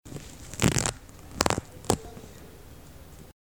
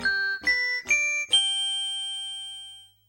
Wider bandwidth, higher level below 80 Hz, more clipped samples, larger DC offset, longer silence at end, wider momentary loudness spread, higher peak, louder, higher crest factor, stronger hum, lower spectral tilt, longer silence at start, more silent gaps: first, over 20 kHz vs 17 kHz; first, -46 dBFS vs -62 dBFS; neither; first, 0.2% vs under 0.1%; second, 0.1 s vs 0.25 s; first, 23 LU vs 15 LU; first, -4 dBFS vs -12 dBFS; second, -28 LUFS vs -24 LUFS; first, 26 dB vs 16 dB; neither; first, -3.5 dB/octave vs 2 dB/octave; about the same, 0.05 s vs 0 s; neither